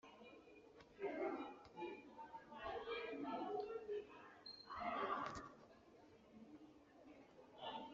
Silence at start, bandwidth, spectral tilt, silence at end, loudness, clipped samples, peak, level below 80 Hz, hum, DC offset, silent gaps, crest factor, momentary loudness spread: 0.05 s; 7.4 kHz; -2.5 dB/octave; 0 s; -49 LUFS; under 0.1%; -30 dBFS; -78 dBFS; none; under 0.1%; none; 22 dB; 20 LU